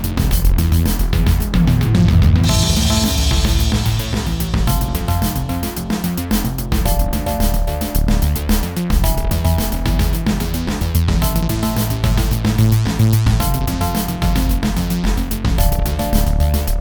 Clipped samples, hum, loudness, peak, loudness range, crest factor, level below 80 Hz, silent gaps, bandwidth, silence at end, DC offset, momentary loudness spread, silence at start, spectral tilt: under 0.1%; none; -17 LUFS; 0 dBFS; 4 LU; 14 dB; -18 dBFS; none; over 20 kHz; 0 s; under 0.1%; 6 LU; 0 s; -5.5 dB/octave